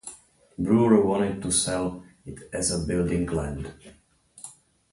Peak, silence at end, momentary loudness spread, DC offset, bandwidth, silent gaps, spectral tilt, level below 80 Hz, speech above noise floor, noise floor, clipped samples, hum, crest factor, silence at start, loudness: -6 dBFS; 0.4 s; 23 LU; under 0.1%; 11.5 kHz; none; -5 dB/octave; -44 dBFS; 24 dB; -48 dBFS; under 0.1%; none; 20 dB; 0.05 s; -24 LUFS